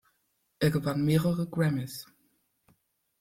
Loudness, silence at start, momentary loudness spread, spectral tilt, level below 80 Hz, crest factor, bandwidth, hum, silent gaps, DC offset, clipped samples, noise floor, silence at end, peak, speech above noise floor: -29 LUFS; 0.6 s; 11 LU; -7 dB/octave; -60 dBFS; 18 dB; 16 kHz; none; none; under 0.1%; under 0.1%; -75 dBFS; 1.15 s; -12 dBFS; 48 dB